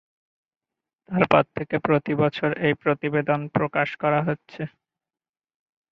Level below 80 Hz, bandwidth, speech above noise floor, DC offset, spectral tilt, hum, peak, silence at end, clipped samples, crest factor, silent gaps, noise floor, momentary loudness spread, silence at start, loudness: -60 dBFS; 6.6 kHz; over 67 dB; under 0.1%; -8.5 dB/octave; none; -2 dBFS; 1.25 s; under 0.1%; 24 dB; none; under -90 dBFS; 10 LU; 1.1 s; -23 LUFS